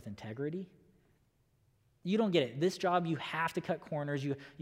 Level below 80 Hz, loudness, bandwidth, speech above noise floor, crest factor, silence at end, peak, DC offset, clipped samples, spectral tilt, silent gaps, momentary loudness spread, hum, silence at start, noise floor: -76 dBFS; -35 LUFS; 16 kHz; 38 dB; 22 dB; 0 s; -14 dBFS; under 0.1%; under 0.1%; -6 dB/octave; none; 13 LU; none; 0 s; -72 dBFS